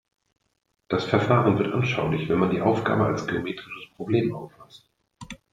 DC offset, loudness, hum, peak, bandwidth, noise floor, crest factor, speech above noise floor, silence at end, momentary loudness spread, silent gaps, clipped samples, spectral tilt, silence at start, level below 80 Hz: under 0.1%; -24 LUFS; none; -6 dBFS; 9.4 kHz; -44 dBFS; 20 dB; 20 dB; 0.2 s; 18 LU; none; under 0.1%; -7.5 dB/octave; 0.9 s; -56 dBFS